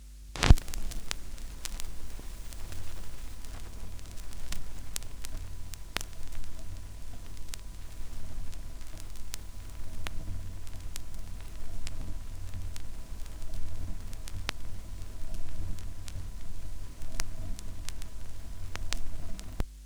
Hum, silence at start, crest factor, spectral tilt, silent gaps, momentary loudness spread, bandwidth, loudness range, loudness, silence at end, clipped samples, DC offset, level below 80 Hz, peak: none; 0 s; 28 dB; -4 dB/octave; none; 8 LU; 17 kHz; 2 LU; -40 LUFS; 0 s; under 0.1%; under 0.1%; -36 dBFS; -2 dBFS